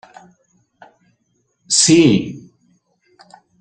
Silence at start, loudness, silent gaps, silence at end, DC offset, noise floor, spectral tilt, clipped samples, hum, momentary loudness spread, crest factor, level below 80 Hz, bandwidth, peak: 1.7 s; -12 LUFS; none; 1.2 s; under 0.1%; -66 dBFS; -3.5 dB/octave; under 0.1%; none; 21 LU; 18 dB; -56 dBFS; 9.8 kHz; 0 dBFS